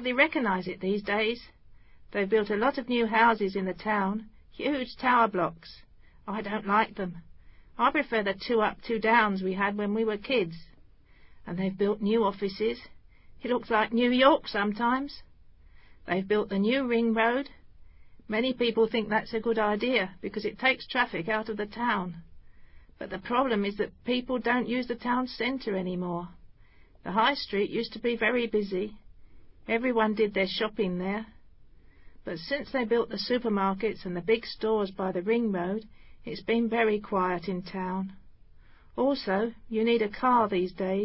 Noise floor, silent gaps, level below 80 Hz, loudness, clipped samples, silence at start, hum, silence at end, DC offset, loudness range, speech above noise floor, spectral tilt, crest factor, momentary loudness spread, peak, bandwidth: -55 dBFS; none; -58 dBFS; -28 LUFS; under 0.1%; 0 s; none; 0 s; under 0.1%; 4 LU; 27 dB; -9.5 dB/octave; 22 dB; 13 LU; -8 dBFS; 5.8 kHz